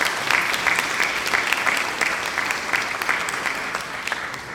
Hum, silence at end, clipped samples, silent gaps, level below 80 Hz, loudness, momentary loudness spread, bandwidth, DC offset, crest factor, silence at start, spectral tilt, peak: none; 0 s; under 0.1%; none; -54 dBFS; -21 LUFS; 7 LU; 19 kHz; under 0.1%; 22 dB; 0 s; -1 dB/octave; -2 dBFS